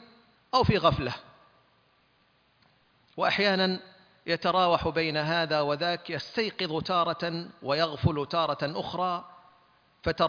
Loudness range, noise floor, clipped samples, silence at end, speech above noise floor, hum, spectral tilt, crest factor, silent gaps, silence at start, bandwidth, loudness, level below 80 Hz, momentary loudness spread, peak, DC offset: 4 LU; -67 dBFS; under 0.1%; 0 s; 39 dB; none; -6 dB/octave; 20 dB; none; 0.55 s; 5.4 kHz; -28 LUFS; -52 dBFS; 11 LU; -8 dBFS; under 0.1%